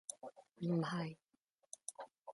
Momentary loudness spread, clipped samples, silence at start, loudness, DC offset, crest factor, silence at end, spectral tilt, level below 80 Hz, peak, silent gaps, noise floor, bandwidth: 18 LU; under 0.1%; 0.1 s; -43 LUFS; under 0.1%; 18 dB; 0 s; -5.5 dB/octave; -84 dBFS; -26 dBFS; none; -82 dBFS; 11.5 kHz